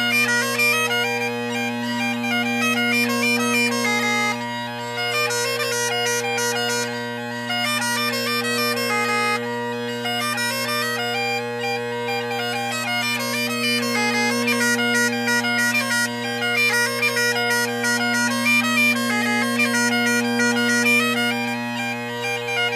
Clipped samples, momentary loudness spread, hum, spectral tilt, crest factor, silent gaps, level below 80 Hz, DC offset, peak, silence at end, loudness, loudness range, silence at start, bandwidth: under 0.1%; 7 LU; none; -2.5 dB/octave; 14 dB; none; -72 dBFS; under 0.1%; -8 dBFS; 0 s; -20 LUFS; 4 LU; 0 s; 15.5 kHz